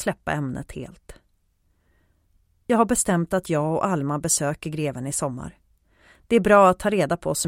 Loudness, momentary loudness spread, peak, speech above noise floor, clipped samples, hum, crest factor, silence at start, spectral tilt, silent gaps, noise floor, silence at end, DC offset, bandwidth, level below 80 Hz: -22 LUFS; 20 LU; -2 dBFS; 44 dB; under 0.1%; none; 20 dB; 0 s; -5 dB/octave; none; -66 dBFS; 0 s; under 0.1%; 16.5 kHz; -50 dBFS